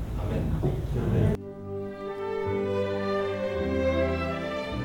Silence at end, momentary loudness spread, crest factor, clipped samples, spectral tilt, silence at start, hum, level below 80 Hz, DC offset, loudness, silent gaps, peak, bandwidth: 0 s; 9 LU; 16 dB; under 0.1%; -8 dB/octave; 0 s; none; -38 dBFS; under 0.1%; -29 LUFS; none; -12 dBFS; 17.5 kHz